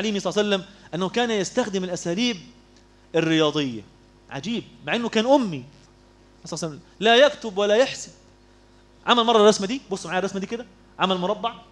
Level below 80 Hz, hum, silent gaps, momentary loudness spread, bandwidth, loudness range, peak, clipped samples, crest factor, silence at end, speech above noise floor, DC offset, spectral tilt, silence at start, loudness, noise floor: -58 dBFS; none; none; 17 LU; 11 kHz; 5 LU; -2 dBFS; under 0.1%; 22 dB; 0.1 s; 31 dB; under 0.1%; -4 dB/octave; 0 s; -22 LUFS; -53 dBFS